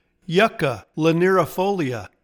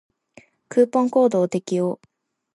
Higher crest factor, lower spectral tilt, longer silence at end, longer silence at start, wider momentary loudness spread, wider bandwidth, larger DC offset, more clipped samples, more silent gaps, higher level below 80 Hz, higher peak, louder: about the same, 16 dB vs 16 dB; about the same, -6 dB/octave vs -7 dB/octave; second, 0.15 s vs 0.6 s; second, 0.3 s vs 0.7 s; about the same, 7 LU vs 8 LU; first, 19 kHz vs 11.5 kHz; neither; neither; neither; first, -56 dBFS vs -74 dBFS; about the same, -4 dBFS vs -6 dBFS; about the same, -20 LUFS vs -20 LUFS